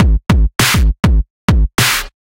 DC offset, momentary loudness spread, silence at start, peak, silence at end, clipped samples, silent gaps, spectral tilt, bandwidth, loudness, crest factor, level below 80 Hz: under 0.1%; 4 LU; 0 s; 0 dBFS; 0.25 s; under 0.1%; 1.30-1.48 s; -4 dB/octave; 16.5 kHz; -13 LUFS; 12 dB; -14 dBFS